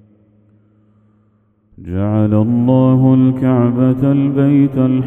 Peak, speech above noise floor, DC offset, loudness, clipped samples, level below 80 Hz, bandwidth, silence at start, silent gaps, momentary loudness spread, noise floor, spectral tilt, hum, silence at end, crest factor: 0 dBFS; 44 dB; under 0.1%; -13 LUFS; under 0.1%; -48 dBFS; 3.7 kHz; 1.8 s; none; 5 LU; -56 dBFS; -11.5 dB/octave; none; 0 s; 14 dB